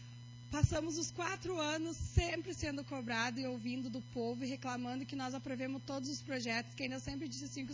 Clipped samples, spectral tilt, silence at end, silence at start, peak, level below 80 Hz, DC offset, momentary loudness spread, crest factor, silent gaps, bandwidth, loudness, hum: under 0.1%; -4.5 dB/octave; 0 s; 0 s; -16 dBFS; -50 dBFS; under 0.1%; 7 LU; 22 dB; none; 7.6 kHz; -40 LUFS; none